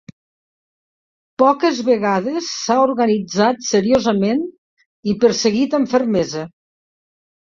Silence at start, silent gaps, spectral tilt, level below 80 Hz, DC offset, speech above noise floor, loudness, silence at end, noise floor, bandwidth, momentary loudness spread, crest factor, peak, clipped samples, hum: 1.4 s; 4.58-4.77 s, 4.86-5.03 s; -4.5 dB/octave; -56 dBFS; under 0.1%; over 74 dB; -17 LUFS; 1.1 s; under -90 dBFS; 7.6 kHz; 9 LU; 16 dB; -2 dBFS; under 0.1%; none